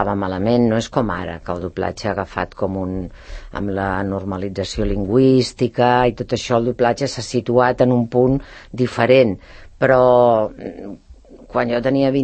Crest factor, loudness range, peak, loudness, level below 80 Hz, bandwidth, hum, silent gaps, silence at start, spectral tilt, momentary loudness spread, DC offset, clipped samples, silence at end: 18 dB; 7 LU; 0 dBFS; -18 LUFS; -38 dBFS; 8.8 kHz; none; none; 0 s; -6.5 dB/octave; 13 LU; under 0.1%; under 0.1%; 0 s